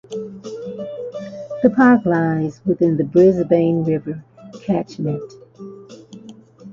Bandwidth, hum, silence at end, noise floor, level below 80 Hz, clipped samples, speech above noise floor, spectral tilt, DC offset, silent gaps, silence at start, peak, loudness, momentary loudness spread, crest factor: 7.4 kHz; none; 0 s; -41 dBFS; -56 dBFS; under 0.1%; 25 dB; -8.5 dB/octave; under 0.1%; none; 0.1 s; -2 dBFS; -17 LUFS; 21 LU; 18 dB